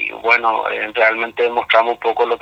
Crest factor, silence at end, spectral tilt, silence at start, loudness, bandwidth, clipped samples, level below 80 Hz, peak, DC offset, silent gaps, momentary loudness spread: 16 dB; 0.05 s; -3.5 dB/octave; 0 s; -16 LUFS; 7.8 kHz; under 0.1%; -60 dBFS; 0 dBFS; under 0.1%; none; 5 LU